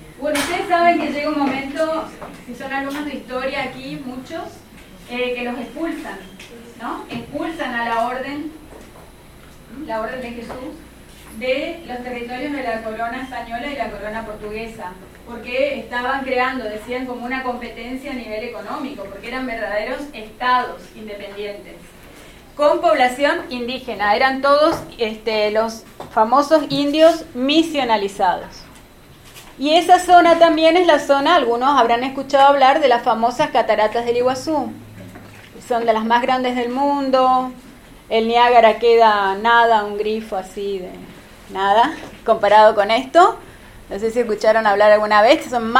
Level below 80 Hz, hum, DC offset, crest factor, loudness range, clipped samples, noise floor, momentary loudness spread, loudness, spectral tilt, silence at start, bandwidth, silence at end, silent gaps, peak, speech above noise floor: -48 dBFS; none; under 0.1%; 18 dB; 12 LU; under 0.1%; -44 dBFS; 18 LU; -17 LUFS; -4 dB/octave; 0 s; 16 kHz; 0 s; none; 0 dBFS; 26 dB